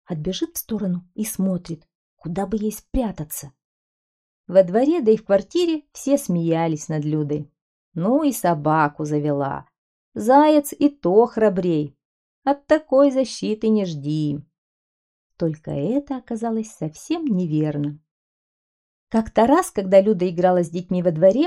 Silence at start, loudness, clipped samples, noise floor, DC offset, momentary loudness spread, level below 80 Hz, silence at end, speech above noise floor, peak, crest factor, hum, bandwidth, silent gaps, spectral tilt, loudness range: 0.1 s; -21 LUFS; under 0.1%; under -90 dBFS; under 0.1%; 12 LU; -48 dBFS; 0 s; over 70 dB; -2 dBFS; 18 dB; none; 14 kHz; 1.95-2.17 s, 3.64-4.44 s, 7.61-7.92 s, 9.78-10.12 s, 12.05-12.42 s, 14.58-15.30 s, 18.11-19.07 s; -6.5 dB/octave; 7 LU